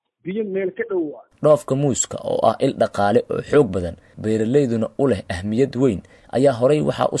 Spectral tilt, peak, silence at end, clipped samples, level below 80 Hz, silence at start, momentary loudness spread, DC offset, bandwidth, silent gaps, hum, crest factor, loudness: -6 dB/octave; -4 dBFS; 0 s; under 0.1%; -54 dBFS; 0.25 s; 9 LU; under 0.1%; 12 kHz; none; none; 16 dB; -20 LUFS